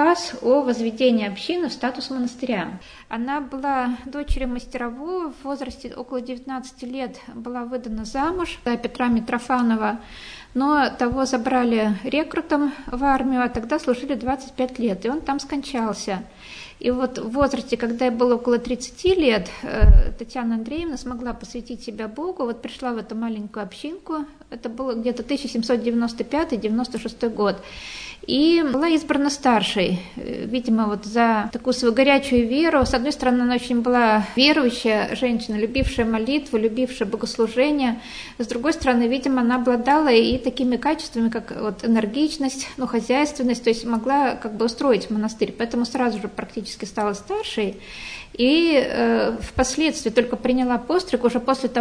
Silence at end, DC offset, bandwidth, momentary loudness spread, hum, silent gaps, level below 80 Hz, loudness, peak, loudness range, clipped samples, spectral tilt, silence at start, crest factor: 0 s; under 0.1%; 10.5 kHz; 13 LU; none; none; -32 dBFS; -22 LUFS; -2 dBFS; 9 LU; under 0.1%; -5 dB/octave; 0 s; 20 dB